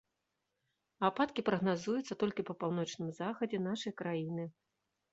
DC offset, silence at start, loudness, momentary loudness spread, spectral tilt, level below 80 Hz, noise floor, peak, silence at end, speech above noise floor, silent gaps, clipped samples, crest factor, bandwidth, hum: under 0.1%; 1 s; -37 LUFS; 7 LU; -5 dB/octave; -76 dBFS; -86 dBFS; -16 dBFS; 0.6 s; 50 dB; none; under 0.1%; 22 dB; 8 kHz; none